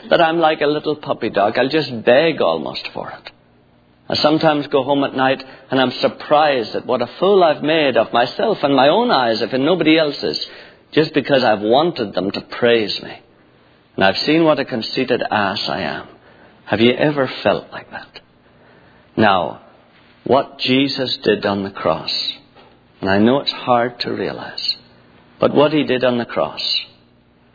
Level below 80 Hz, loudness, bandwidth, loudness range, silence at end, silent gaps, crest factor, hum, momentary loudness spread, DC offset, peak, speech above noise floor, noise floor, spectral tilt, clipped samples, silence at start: -58 dBFS; -17 LUFS; 5 kHz; 4 LU; 0.7 s; none; 18 dB; none; 10 LU; under 0.1%; 0 dBFS; 36 dB; -52 dBFS; -6.5 dB/octave; under 0.1%; 0 s